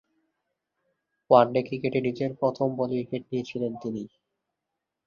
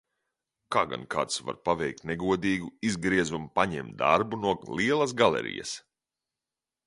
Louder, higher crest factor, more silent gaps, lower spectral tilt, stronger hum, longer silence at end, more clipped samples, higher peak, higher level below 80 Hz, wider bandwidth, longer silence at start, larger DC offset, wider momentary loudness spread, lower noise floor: about the same, -26 LUFS vs -28 LUFS; about the same, 24 dB vs 22 dB; neither; first, -8 dB/octave vs -4.5 dB/octave; neither; about the same, 1 s vs 1.05 s; neither; about the same, -4 dBFS vs -6 dBFS; second, -68 dBFS vs -58 dBFS; second, 7 kHz vs 11.5 kHz; first, 1.3 s vs 0.7 s; neither; first, 14 LU vs 7 LU; second, -85 dBFS vs under -90 dBFS